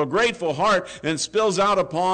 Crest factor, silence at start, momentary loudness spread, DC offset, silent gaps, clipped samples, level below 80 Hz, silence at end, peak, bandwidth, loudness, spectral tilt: 8 dB; 0 s; 4 LU; under 0.1%; none; under 0.1%; -56 dBFS; 0 s; -12 dBFS; 9.4 kHz; -21 LUFS; -3.5 dB/octave